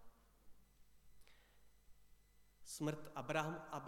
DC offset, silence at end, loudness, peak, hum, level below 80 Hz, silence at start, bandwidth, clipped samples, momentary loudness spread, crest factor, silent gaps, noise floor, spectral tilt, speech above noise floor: under 0.1%; 0 s; -45 LUFS; -24 dBFS; 50 Hz at -70 dBFS; -72 dBFS; 0 s; 18 kHz; under 0.1%; 11 LU; 26 dB; none; -70 dBFS; -5 dB/octave; 26 dB